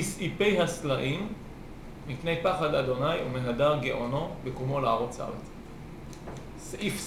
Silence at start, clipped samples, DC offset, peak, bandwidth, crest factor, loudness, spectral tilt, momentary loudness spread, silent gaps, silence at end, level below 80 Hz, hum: 0 s; under 0.1%; under 0.1%; -12 dBFS; 16 kHz; 18 dB; -29 LUFS; -5 dB/octave; 18 LU; none; 0 s; -50 dBFS; none